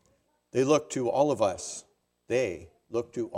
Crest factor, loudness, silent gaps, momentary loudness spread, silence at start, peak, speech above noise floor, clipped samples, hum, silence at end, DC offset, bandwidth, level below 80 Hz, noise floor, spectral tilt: 18 dB; -29 LUFS; none; 13 LU; 0.55 s; -10 dBFS; 42 dB; under 0.1%; none; 0 s; under 0.1%; 13 kHz; -68 dBFS; -70 dBFS; -5 dB/octave